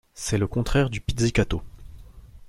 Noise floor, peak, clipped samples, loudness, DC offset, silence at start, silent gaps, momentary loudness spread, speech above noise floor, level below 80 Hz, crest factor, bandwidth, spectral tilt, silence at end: -45 dBFS; -6 dBFS; under 0.1%; -25 LUFS; under 0.1%; 0.15 s; none; 5 LU; 21 dB; -36 dBFS; 20 dB; 16 kHz; -5.5 dB/octave; 0 s